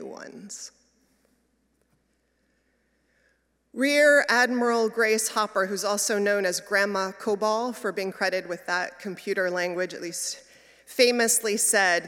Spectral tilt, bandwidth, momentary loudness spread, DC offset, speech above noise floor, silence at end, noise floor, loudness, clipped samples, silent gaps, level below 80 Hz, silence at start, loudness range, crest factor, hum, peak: -2 dB/octave; 17 kHz; 17 LU; under 0.1%; 46 dB; 0 s; -71 dBFS; -24 LUFS; under 0.1%; none; -76 dBFS; 0 s; 6 LU; 20 dB; none; -6 dBFS